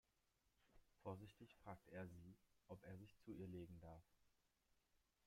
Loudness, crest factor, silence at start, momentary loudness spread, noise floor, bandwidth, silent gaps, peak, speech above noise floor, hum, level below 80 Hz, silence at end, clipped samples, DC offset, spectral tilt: -60 LUFS; 20 dB; 0.6 s; 8 LU; -86 dBFS; 16 kHz; none; -42 dBFS; 27 dB; none; -80 dBFS; 0.3 s; under 0.1%; under 0.1%; -7.5 dB/octave